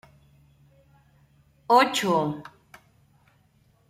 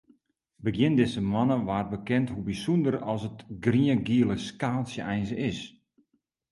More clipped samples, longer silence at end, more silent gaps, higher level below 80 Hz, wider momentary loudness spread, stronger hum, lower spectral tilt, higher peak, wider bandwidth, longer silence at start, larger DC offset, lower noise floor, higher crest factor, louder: neither; first, 1.45 s vs 0.8 s; neither; second, -66 dBFS vs -54 dBFS; first, 20 LU vs 9 LU; neither; second, -4 dB/octave vs -7 dB/octave; first, -6 dBFS vs -10 dBFS; first, 16 kHz vs 11.5 kHz; first, 1.7 s vs 0.6 s; neither; second, -63 dBFS vs -74 dBFS; about the same, 22 dB vs 18 dB; first, -22 LUFS vs -27 LUFS